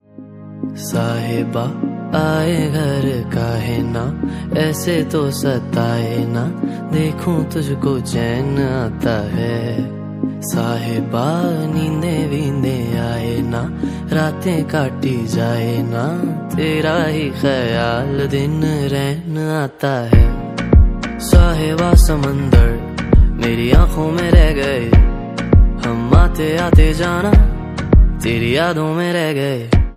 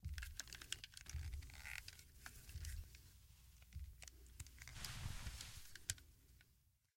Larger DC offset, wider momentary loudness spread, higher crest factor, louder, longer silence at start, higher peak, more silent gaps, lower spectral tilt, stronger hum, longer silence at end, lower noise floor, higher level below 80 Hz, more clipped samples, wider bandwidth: neither; second, 8 LU vs 14 LU; second, 14 dB vs 30 dB; first, -17 LUFS vs -53 LUFS; first, 0.2 s vs 0 s; first, 0 dBFS vs -22 dBFS; neither; first, -6.5 dB/octave vs -2 dB/octave; neither; second, 0 s vs 0.25 s; second, -35 dBFS vs -77 dBFS; first, -20 dBFS vs -58 dBFS; neither; about the same, 15 kHz vs 16.5 kHz